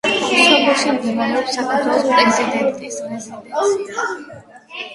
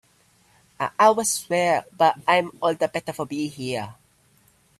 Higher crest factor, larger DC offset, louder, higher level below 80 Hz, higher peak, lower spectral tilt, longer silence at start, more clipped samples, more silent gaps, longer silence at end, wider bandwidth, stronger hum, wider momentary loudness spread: about the same, 18 dB vs 20 dB; neither; first, -16 LUFS vs -22 LUFS; about the same, -62 dBFS vs -66 dBFS; first, 0 dBFS vs -4 dBFS; about the same, -2.5 dB/octave vs -3.5 dB/octave; second, 0.05 s vs 0.8 s; neither; neither; second, 0 s vs 0.85 s; second, 11.5 kHz vs 14.5 kHz; neither; first, 17 LU vs 12 LU